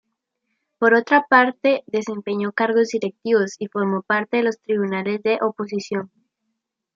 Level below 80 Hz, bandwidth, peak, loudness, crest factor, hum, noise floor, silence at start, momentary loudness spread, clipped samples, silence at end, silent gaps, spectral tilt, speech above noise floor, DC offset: -74 dBFS; 7.6 kHz; -2 dBFS; -20 LUFS; 20 dB; none; -78 dBFS; 0.8 s; 11 LU; under 0.1%; 0.9 s; none; -5.5 dB/octave; 58 dB; under 0.1%